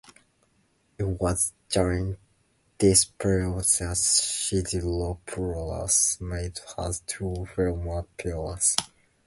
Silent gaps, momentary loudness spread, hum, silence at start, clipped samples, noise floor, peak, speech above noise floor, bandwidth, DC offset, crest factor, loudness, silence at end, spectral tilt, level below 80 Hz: none; 12 LU; none; 1 s; under 0.1%; -67 dBFS; -2 dBFS; 41 dB; 12 kHz; under 0.1%; 26 dB; -25 LUFS; 0.4 s; -3.5 dB/octave; -40 dBFS